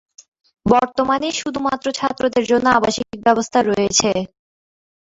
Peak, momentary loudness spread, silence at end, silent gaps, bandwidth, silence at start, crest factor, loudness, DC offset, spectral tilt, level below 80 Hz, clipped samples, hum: -2 dBFS; 6 LU; 0.8 s; none; 8 kHz; 0.65 s; 18 dB; -18 LUFS; under 0.1%; -3.5 dB/octave; -48 dBFS; under 0.1%; none